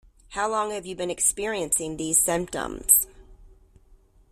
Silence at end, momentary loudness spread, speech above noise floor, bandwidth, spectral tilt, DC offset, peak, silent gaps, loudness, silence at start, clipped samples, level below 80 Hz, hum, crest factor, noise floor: 0.85 s; 13 LU; 31 dB; 16 kHz; -2 dB/octave; under 0.1%; -2 dBFS; none; -23 LUFS; 0.3 s; under 0.1%; -50 dBFS; none; 24 dB; -56 dBFS